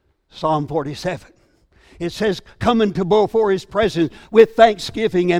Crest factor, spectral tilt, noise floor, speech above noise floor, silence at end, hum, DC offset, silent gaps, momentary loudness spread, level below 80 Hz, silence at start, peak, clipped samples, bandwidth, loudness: 18 dB; -6 dB/octave; -55 dBFS; 38 dB; 0 s; none; under 0.1%; none; 12 LU; -46 dBFS; 0.35 s; 0 dBFS; under 0.1%; 13 kHz; -18 LUFS